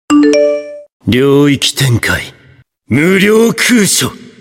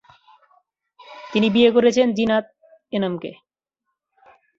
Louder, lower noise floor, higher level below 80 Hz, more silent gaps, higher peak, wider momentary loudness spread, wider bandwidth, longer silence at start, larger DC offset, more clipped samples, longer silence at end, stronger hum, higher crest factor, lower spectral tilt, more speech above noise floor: first, -10 LUFS vs -19 LUFS; second, -45 dBFS vs -80 dBFS; first, -42 dBFS vs -62 dBFS; first, 0.92-1.00 s vs none; about the same, 0 dBFS vs -2 dBFS; second, 11 LU vs 16 LU; first, 17 kHz vs 7.6 kHz; second, 0.1 s vs 1.1 s; neither; neither; second, 0.25 s vs 1.25 s; neither; second, 10 dB vs 20 dB; about the same, -4.5 dB/octave vs -5.5 dB/octave; second, 35 dB vs 62 dB